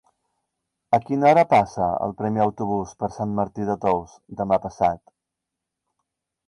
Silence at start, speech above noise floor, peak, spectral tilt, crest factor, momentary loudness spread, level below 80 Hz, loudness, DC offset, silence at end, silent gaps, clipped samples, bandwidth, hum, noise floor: 0.9 s; 62 dB; -6 dBFS; -7.5 dB/octave; 18 dB; 11 LU; -54 dBFS; -22 LUFS; under 0.1%; 1.5 s; none; under 0.1%; 11 kHz; none; -84 dBFS